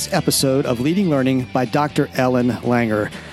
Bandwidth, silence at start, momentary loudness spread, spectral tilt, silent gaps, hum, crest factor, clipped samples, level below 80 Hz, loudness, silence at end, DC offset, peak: 15 kHz; 0 s; 3 LU; -5 dB/octave; none; none; 14 dB; under 0.1%; -48 dBFS; -18 LUFS; 0 s; under 0.1%; -4 dBFS